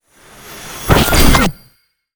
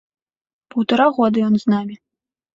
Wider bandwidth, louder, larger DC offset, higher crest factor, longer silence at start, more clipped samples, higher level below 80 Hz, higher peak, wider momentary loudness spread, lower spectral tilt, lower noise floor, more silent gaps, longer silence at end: first, over 20 kHz vs 7.4 kHz; first, -12 LUFS vs -18 LUFS; neither; about the same, 14 dB vs 16 dB; second, 0.5 s vs 0.75 s; neither; first, -20 dBFS vs -62 dBFS; first, 0 dBFS vs -4 dBFS; first, 21 LU vs 10 LU; second, -4 dB/octave vs -7.5 dB/octave; second, -54 dBFS vs -85 dBFS; neither; about the same, 0.65 s vs 0.6 s